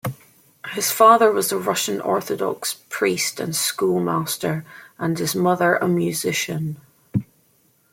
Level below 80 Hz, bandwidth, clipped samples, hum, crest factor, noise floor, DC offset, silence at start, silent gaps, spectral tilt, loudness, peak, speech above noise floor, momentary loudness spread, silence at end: -62 dBFS; 16.5 kHz; under 0.1%; none; 20 dB; -61 dBFS; under 0.1%; 0.05 s; none; -4 dB/octave; -21 LUFS; -2 dBFS; 40 dB; 13 LU; 0.7 s